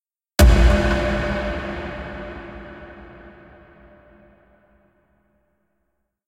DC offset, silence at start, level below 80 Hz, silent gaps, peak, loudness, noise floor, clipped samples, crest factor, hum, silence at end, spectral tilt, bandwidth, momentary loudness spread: under 0.1%; 0.4 s; -24 dBFS; none; 0 dBFS; -20 LUFS; -73 dBFS; under 0.1%; 22 dB; none; 3 s; -5.5 dB/octave; 16 kHz; 25 LU